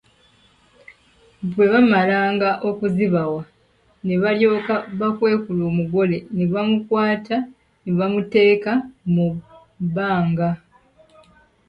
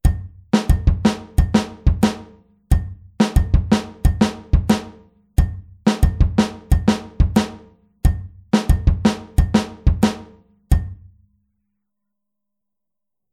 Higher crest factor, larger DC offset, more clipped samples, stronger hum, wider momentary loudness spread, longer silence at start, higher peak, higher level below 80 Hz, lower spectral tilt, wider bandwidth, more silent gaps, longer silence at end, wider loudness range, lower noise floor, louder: about the same, 16 dB vs 18 dB; neither; neither; neither; first, 11 LU vs 5 LU; first, 1.4 s vs 0.05 s; about the same, -4 dBFS vs -2 dBFS; second, -56 dBFS vs -22 dBFS; first, -9 dB/octave vs -6.5 dB/octave; second, 5.4 kHz vs 14.5 kHz; neither; second, 1.1 s vs 2.4 s; about the same, 2 LU vs 3 LU; second, -59 dBFS vs -86 dBFS; about the same, -20 LUFS vs -20 LUFS